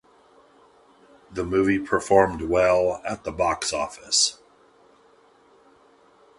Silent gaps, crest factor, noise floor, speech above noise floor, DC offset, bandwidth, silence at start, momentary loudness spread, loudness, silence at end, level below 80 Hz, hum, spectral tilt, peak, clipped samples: none; 24 dB; -57 dBFS; 34 dB; under 0.1%; 11.5 kHz; 1.3 s; 11 LU; -22 LUFS; 2.05 s; -50 dBFS; none; -3 dB/octave; -2 dBFS; under 0.1%